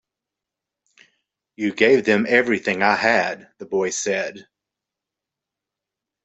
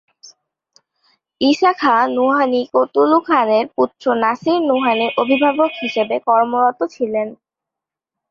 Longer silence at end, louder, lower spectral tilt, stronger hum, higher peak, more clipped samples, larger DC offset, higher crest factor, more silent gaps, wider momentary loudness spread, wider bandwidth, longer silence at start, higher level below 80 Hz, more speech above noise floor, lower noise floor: first, 1.85 s vs 0.95 s; second, -19 LUFS vs -16 LUFS; second, -3.5 dB/octave vs -5 dB/octave; neither; about the same, -2 dBFS vs -2 dBFS; neither; neither; first, 20 dB vs 14 dB; neither; first, 10 LU vs 6 LU; first, 8.2 kHz vs 7.4 kHz; first, 1.6 s vs 0.25 s; about the same, -68 dBFS vs -64 dBFS; second, 66 dB vs 70 dB; about the same, -86 dBFS vs -85 dBFS